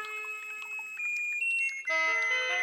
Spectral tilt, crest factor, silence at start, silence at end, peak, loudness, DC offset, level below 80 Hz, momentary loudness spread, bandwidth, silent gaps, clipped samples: 2.5 dB/octave; 14 dB; 0 s; 0 s; -18 dBFS; -29 LUFS; under 0.1%; -90 dBFS; 10 LU; 19 kHz; none; under 0.1%